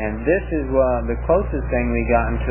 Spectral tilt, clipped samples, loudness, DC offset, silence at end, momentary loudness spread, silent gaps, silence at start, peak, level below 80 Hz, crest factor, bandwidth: -12 dB/octave; under 0.1%; -20 LUFS; 0.1%; 0 s; 3 LU; none; 0 s; -4 dBFS; -26 dBFS; 16 dB; 3.1 kHz